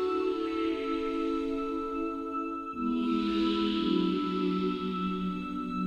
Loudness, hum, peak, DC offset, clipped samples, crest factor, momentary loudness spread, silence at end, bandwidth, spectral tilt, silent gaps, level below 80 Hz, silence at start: -31 LUFS; none; -16 dBFS; under 0.1%; under 0.1%; 14 dB; 6 LU; 0 s; 8.4 kHz; -7.5 dB/octave; none; -54 dBFS; 0 s